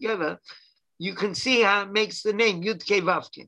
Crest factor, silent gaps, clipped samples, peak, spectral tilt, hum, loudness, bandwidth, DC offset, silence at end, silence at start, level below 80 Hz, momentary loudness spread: 20 dB; none; under 0.1%; -6 dBFS; -3.5 dB/octave; none; -24 LUFS; 11 kHz; under 0.1%; 0.05 s; 0 s; -70 dBFS; 12 LU